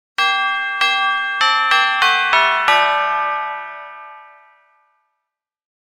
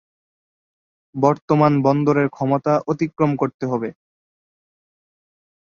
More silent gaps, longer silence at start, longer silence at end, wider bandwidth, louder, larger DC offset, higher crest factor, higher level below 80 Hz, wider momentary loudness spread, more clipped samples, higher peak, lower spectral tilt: second, none vs 1.42-1.48 s, 3.54-3.59 s; second, 0.2 s vs 1.15 s; second, 1.6 s vs 1.85 s; first, 18 kHz vs 7 kHz; first, -15 LUFS vs -19 LUFS; neither; about the same, 18 dB vs 20 dB; second, -68 dBFS vs -60 dBFS; first, 16 LU vs 8 LU; neither; about the same, 0 dBFS vs -2 dBFS; second, 1 dB/octave vs -8.5 dB/octave